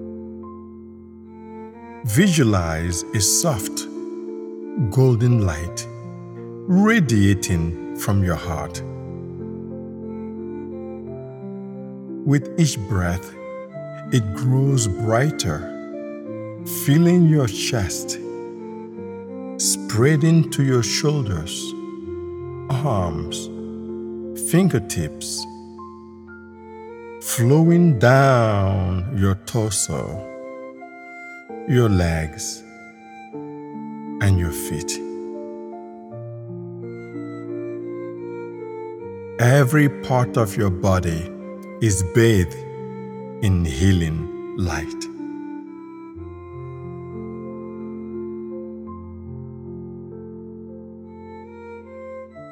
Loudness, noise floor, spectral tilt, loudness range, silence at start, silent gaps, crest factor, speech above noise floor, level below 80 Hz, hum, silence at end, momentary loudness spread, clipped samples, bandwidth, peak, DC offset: -21 LUFS; -42 dBFS; -5.5 dB/octave; 14 LU; 0 s; none; 22 dB; 23 dB; -42 dBFS; none; 0 s; 21 LU; under 0.1%; 19.5 kHz; 0 dBFS; under 0.1%